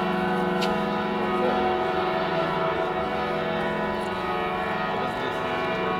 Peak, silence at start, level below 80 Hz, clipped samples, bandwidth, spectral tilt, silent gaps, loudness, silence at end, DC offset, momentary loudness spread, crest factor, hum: -12 dBFS; 0 s; -50 dBFS; under 0.1%; 17.5 kHz; -6 dB/octave; none; -26 LUFS; 0 s; under 0.1%; 3 LU; 14 dB; none